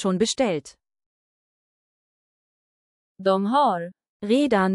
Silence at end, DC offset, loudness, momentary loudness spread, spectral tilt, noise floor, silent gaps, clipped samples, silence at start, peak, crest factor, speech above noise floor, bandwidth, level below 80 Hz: 0 s; under 0.1%; -23 LUFS; 11 LU; -5 dB/octave; under -90 dBFS; 1.06-3.15 s, 4.09-4.20 s; under 0.1%; 0 s; -8 dBFS; 16 dB; over 68 dB; 12 kHz; -64 dBFS